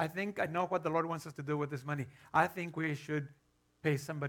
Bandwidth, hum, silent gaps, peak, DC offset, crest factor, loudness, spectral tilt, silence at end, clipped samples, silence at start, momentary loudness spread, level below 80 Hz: 18 kHz; none; none; -14 dBFS; under 0.1%; 22 dB; -36 LUFS; -6.5 dB/octave; 0 s; under 0.1%; 0 s; 8 LU; -76 dBFS